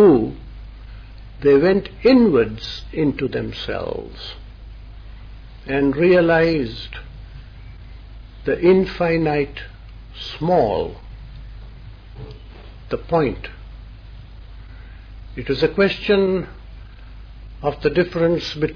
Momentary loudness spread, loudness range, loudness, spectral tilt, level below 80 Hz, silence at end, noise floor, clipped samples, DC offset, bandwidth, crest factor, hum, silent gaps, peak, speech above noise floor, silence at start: 26 LU; 9 LU; -19 LUFS; -8 dB/octave; -38 dBFS; 0 s; -38 dBFS; under 0.1%; under 0.1%; 5.4 kHz; 18 dB; none; none; -4 dBFS; 20 dB; 0 s